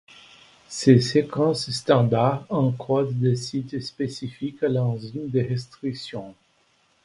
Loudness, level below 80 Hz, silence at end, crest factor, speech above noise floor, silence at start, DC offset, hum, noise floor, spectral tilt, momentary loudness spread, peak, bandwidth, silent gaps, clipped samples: -23 LUFS; -58 dBFS; 0.7 s; 22 dB; 41 dB; 0.7 s; under 0.1%; none; -64 dBFS; -6.5 dB/octave; 14 LU; -2 dBFS; 11.5 kHz; none; under 0.1%